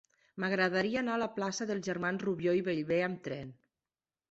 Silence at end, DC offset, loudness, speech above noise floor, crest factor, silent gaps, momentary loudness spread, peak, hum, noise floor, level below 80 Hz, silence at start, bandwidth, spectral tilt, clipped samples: 0.8 s; under 0.1%; -33 LUFS; over 57 dB; 18 dB; none; 11 LU; -16 dBFS; none; under -90 dBFS; -72 dBFS; 0.35 s; 8 kHz; -5.5 dB/octave; under 0.1%